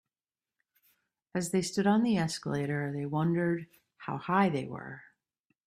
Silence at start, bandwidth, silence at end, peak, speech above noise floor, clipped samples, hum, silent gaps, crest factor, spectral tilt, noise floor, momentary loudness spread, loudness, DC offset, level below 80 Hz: 1.35 s; 14 kHz; 0.65 s; -12 dBFS; over 60 dB; under 0.1%; none; none; 20 dB; -6 dB/octave; under -90 dBFS; 14 LU; -31 LUFS; under 0.1%; -68 dBFS